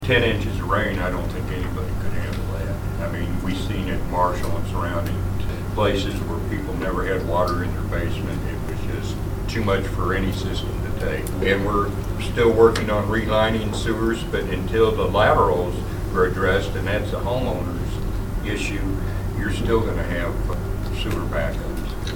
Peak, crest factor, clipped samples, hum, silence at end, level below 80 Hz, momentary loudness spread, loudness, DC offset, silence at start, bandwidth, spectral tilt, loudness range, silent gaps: -2 dBFS; 20 dB; under 0.1%; none; 0 s; -30 dBFS; 9 LU; -23 LUFS; under 0.1%; 0 s; 19 kHz; -6.5 dB/octave; 5 LU; none